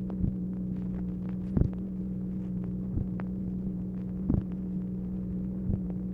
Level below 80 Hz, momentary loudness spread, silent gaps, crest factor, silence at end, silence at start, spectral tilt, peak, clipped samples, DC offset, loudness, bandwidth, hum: -42 dBFS; 4 LU; none; 22 dB; 0 s; 0 s; -12 dB/octave; -10 dBFS; under 0.1%; under 0.1%; -33 LUFS; 2.8 kHz; none